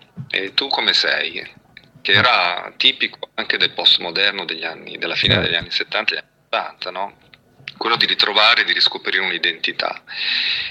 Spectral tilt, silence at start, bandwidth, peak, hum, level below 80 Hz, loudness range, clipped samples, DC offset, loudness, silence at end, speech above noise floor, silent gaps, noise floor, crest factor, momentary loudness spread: -3.5 dB/octave; 0.15 s; 13.5 kHz; 0 dBFS; none; -54 dBFS; 4 LU; under 0.1%; under 0.1%; -17 LUFS; 0 s; 20 dB; none; -40 dBFS; 20 dB; 14 LU